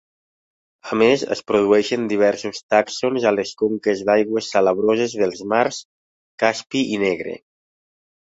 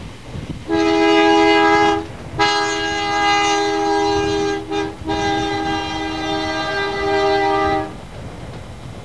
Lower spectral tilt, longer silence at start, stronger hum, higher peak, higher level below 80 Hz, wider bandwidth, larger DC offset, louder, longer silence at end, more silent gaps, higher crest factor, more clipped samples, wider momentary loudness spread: about the same, -4.5 dB/octave vs -4 dB/octave; first, 0.85 s vs 0 s; neither; about the same, -2 dBFS vs -2 dBFS; second, -62 dBFS vs -40 dBFS; second, 8 kHz vs 11 kHz; second, under 0.1% vs 0.8%; about the same, -19 LUFS vs -17 LUFS; first, 0.9 s vs 0 s; first, 2.63-2.69 s, 5.85-6.38 s vs none; about the same, 18 dB vs 18 dB; neither; second, 8 LU vs 20 LU